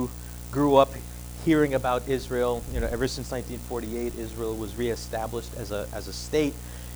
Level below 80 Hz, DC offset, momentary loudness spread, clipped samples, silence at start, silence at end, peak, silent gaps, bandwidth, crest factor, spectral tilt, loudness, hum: -40 dBFS; under 0.1%; 13 LU; under 0.1%; 0 s; 0 s; -4 dBFS; none; over 20 kHz; 22 dB; -5.5 dB/octave; -27 LUFS; 60 Hz at -40 dBFS